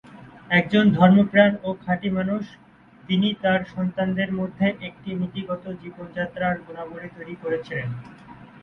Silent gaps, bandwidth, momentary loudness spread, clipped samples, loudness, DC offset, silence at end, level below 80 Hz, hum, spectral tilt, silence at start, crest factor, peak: none; 4.4 kHz; 20 LU; under 0.1%; -22 LUFS; under 0.1%; 0.15 s; -56 dBFS; none; -8.5 dB/octave; 0.15 s; 20 dB; -2 dBFS